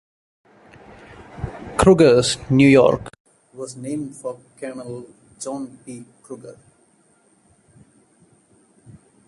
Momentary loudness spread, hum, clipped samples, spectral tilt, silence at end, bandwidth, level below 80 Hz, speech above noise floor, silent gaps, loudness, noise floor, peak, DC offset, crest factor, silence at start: 25 LU; none; under 0.1%; -5.5 dB/octave; 2.75 s; 11.5 kHz; -44 dBFS; 40 dB; 3.20-3.25 s; -17 LUFS; -59 dBFS; -2 dBFS; under 0.1%; 20 dB; 1.35 s